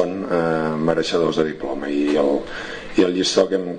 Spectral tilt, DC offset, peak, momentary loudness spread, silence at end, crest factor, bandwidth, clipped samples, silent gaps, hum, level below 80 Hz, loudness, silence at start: -5 dB/octave; under 0.1%; -2 dBFS; 7 LU; 0 s; 18 dB; 9.8 kHz; under 0.1%; none; none; -48 dBFS; -20 LUFS; 0 s